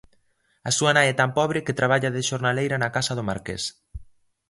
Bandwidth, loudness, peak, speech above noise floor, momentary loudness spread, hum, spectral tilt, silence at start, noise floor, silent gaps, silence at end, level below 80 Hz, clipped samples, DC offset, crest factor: 11.5 kHz; -23 LUFS; -4 dBFS; 42 dB; 11 LU; none; -4 dB/octave; 0.65 s; -65 dBFS; none; 0.45 s; -50 dBFS; under 0.1%; under 0.1%; 20 dB